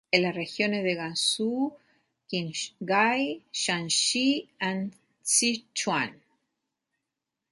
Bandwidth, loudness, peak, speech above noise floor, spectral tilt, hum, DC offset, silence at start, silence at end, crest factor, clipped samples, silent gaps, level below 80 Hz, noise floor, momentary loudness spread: 12 kHz; -27 LUFS; -6 dBFS; 58 dB; -2.5 dB/octave; none; under 0.1%; 0.15 s; 1.35 s; 24 dB; under 0.1%; none; -76 dBFS; -86 dBFS; 11 LU